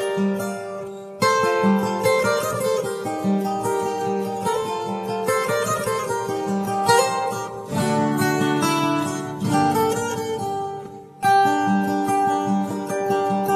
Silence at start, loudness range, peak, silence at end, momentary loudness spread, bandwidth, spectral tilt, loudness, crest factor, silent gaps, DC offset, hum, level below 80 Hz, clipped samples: 0 s; 2 LU; -4 dBFS; 0 s; 8 LU; 14 kHz; -5 dB/octave; -22 LUFS; 18 dB; none; under 0.1%; none; -60 dBFS; under 0.1%